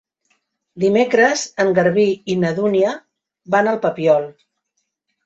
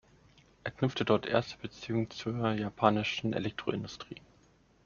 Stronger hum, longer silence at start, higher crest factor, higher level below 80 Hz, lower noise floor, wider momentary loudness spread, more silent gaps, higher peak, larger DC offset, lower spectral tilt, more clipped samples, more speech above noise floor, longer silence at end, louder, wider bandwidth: neither; about the same, 0.75 s vs 0.65 s; second, 18 dB vs 26 dB; about the same, -62 dBFS vs -64 dBFS; first, -73 dBFS vs -65 dBFS; second, 6 LU vs 15 LU; neither; first, -2 dBFS vs -8 dBFS; neither; about the same, -5 dB/octave vs -4.5 dB/octave; neither; first, 57 dB vs 33 dB; first, 0.95 s vs 0.7 s; first, -17 LUFS vs -33 LUFS; first, 8 kHz vs 7.2 kHz